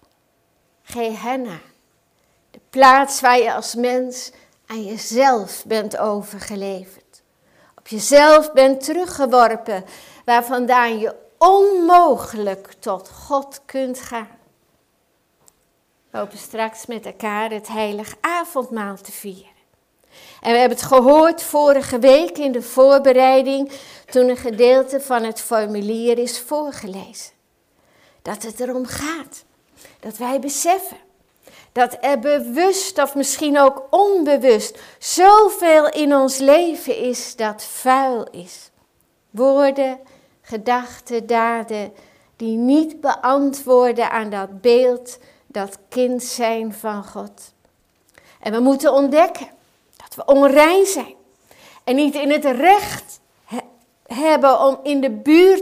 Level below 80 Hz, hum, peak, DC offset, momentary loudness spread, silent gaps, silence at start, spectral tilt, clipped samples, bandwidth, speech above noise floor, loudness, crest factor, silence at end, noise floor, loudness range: -58 dBFS; none; -2 dBFS; under 0.1%; 19 LU; none; 0.9 s; -3.5 dB/octave; under 0.1%; 16 kHz; 48 dB; -16 LUFS; 16 dB; 0 s; -64 dBFS; 11 LU